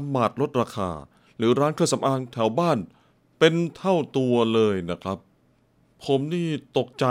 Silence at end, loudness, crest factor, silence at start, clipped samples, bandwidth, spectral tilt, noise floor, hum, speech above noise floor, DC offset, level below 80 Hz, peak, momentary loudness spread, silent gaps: 0 s; -24 LUFS; 20 dB; 0 s; under 0.1%; 15.5 kHz; -6 dB/octave; -63 dBFS; none; 39 dB; under 0.1%; -64 dBFS; -4 dBFS; 11 LU; none